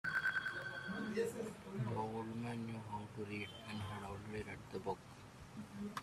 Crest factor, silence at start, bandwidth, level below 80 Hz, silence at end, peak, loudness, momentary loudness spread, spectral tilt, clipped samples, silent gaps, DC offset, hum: 16 dB; 0.05 s; 15 kHz; -68 dBFS; 0 s; -28 dBFS; -44 LUFS; 9 LU; -5.5 dB/octave; under 0.1%; none; under 0.1%; none